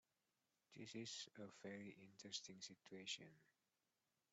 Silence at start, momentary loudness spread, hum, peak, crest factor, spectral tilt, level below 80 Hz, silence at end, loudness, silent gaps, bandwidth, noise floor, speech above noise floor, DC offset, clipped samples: 0.7 s; 9 LU; none; -36 dBFS; 22 dB; -2.5 dB/octave; under -90 dBFS; 0.85 s; -55 LUFS; none; 8.2 kHz; under -90 dBFS; over 33 dB; under 0.1%; under 0.1%